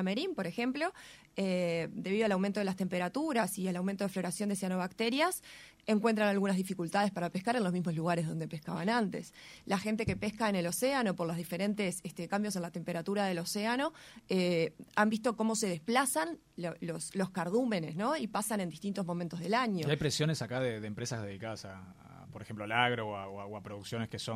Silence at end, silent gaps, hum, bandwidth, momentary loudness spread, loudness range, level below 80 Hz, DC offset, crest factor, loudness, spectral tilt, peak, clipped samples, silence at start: 0 s; none; none; 16 kHz; 11 LU; 3 LU; -66 dBFS; under 0.1%; 20 dB; -34 LUFS; -5 dB/octave; -14 dBFS; under 0.1%; 0 s